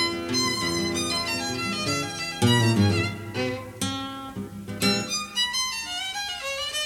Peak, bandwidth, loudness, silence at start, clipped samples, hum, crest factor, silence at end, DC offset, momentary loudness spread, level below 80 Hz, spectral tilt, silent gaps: -8 dBFS; 17.5 kHz; -25 LUFS; 0 s; under 0.1%; none; 18 dB; 0 s; under 0.1%; 9 LU; -54 dBFS; -3.5 dB/octave; none